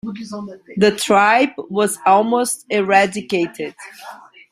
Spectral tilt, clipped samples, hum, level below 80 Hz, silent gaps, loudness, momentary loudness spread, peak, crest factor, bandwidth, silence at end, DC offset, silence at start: -4 dB/octave; under 0.1%; none; -60 dBFS; none; -16 LUFS; 18 LU; -2 dBFS; 16 dB; 16 kHz; 0.35 s; under 0.1%; 0.05 s